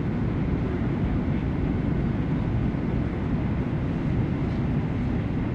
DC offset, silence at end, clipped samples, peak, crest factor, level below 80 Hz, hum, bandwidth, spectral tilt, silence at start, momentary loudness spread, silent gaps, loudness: under 0.1%; 0 s; under 0.1%; -14 dBFS; 12 dB; -34 dBFS; none; 7 kHz; -10 dB/octave; 0 s; 1 LU; none; -27 LUFS